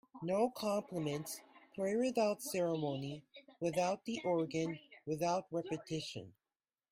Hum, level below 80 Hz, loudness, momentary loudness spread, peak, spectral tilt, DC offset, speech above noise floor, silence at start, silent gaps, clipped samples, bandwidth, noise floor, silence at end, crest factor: none; -78 dBFS; -38 LUFS; 12 LU; -22 dBFS; -5.5 dB/octave; under 0.1%; over 53 dB; 0.15 s; none; under 0.1%; 16 kHz; under -90 dBFS; 0.6 s; 18 dB